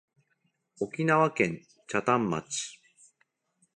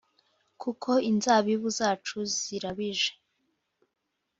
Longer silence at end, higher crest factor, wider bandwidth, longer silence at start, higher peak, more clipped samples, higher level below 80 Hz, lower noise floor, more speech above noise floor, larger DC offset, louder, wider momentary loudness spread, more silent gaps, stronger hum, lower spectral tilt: second, 1.05 s vs 1.3 s; about the same, 22 dB vs 22 dB; first, 11.5 kHz vs 8 kHz; first, 0.8 s vs 0.6 s; about the same, -8 dBFS vs -8 dBFS; neither; about the same, -68 dBFS vs -70 dBFS; second, -75 dBFS vs -81 dBFS; second, 48 dB vs 54 dB; neither; about the same, -28 LUFS vs -28 LUFS; first, 13 LU vs 10 LU; neither; neither; first, -5 dB/octave vs -3 dB/octave